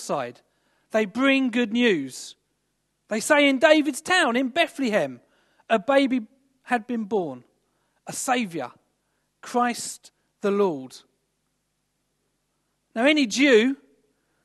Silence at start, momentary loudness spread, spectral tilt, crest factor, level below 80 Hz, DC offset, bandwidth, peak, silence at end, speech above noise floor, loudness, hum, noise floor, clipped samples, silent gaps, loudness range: 0 s; 17 LU; -3.5 dB/octave; 22 dB; -76 dBFS; under 0.1%; 13 kHz; -2 dBFS; 0.7 s; 52 dB; -22 LUFS; 50 Hz at -75 dBFS; -75 dBFS; under 0.1%; none; 8 LU